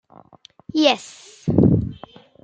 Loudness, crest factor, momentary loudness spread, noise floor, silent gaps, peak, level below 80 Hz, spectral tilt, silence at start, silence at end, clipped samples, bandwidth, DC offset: -19 LUFS; 20 dB; 15 LU; -50 dBFS; none; -2 dBFS; -44 dBFS; -6.5 dB/octave; 0.75 s; 0.45 s; under 0.1%; 9.2 kHz; under 0.1%